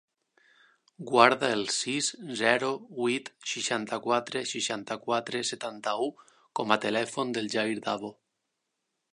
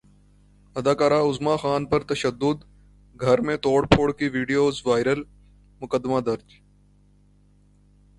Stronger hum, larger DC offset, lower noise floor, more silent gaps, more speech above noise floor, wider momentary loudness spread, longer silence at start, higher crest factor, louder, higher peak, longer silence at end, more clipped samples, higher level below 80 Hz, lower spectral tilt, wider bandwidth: second, none vs 50 Hz at -50 dBFS; neither; first, -82 dBFS vs -57 dBFS; neither; first, 53 dB vs 35 dB; about the same, 10 LU vs 9 LU; first, 1 s vs 0.75 s; about the same, 28 dB vs 24 dB; second, -29 LUFS vs -23 LUFS; about the same, -2 dBFS vs 0 dBFS; second, 1 s vs 1.8 s; neither; second, -78 dBFS vs -48 dBFS; second, -2.5 dB/octave vs -6 dB/octave; about the same, 11 kHz vs 11.5 kHz